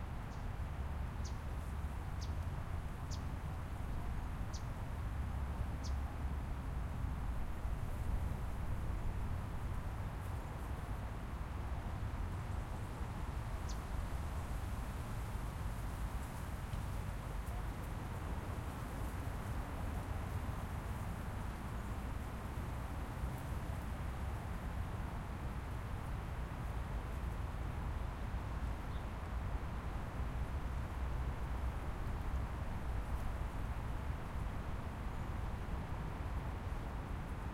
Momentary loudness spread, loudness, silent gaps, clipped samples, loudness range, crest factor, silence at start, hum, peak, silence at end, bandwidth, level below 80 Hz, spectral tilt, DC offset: 2 LU; -44 LUFS; none; under 0.1%; 1 LU; 14 dB; 0 s; none; -28 dBFS; 0 s; 16.5 kHz; -44 dBFS; -6.5 dB/octave; under 0.1%